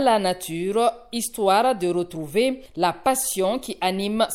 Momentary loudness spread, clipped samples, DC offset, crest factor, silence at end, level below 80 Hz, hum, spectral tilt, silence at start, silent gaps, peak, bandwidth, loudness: 6 LU; under 0.1%; under 0.1%; 16 dB; 0 s; -54 dBFS; none; -3.5 dB/octave; 0 s; none; -6 dBFS; 17 kHz; -23 LUFS